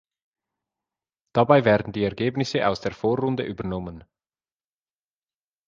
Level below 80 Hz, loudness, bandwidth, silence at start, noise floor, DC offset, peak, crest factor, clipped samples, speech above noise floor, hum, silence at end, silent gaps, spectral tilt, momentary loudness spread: -54 dBFS; -23 LUFS; 7.6 kHz; 1.35 s; under -90 dBFS; under 0.1%; -2 dBFS; 24 dB; under 0.1%; over 67 dB; none; 1.7 s; none; -7 dB/octave; 13 LU